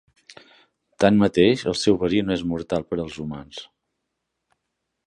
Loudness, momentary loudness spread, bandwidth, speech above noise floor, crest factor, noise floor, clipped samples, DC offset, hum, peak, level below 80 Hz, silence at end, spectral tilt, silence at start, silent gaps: -21 LUFS; 16 LU; 11 kHz; 58 dB; 22 dB; -79 dBFS; under 0.1%; under 0.1%; none; -2 dBFS; -50 dBFS; 1.45 s; -6 dB/octave; 0.3 s; none